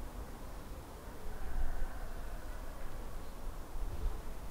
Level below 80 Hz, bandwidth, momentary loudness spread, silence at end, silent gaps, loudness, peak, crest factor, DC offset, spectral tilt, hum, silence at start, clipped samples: -40 dBFS; 16 kHz; 6 LU; 0 s; none; -47 LUFS; -22 dBFS; 16 dB; under 0.1%; -5.5 dB/octave; none; 0 s; under 0.1%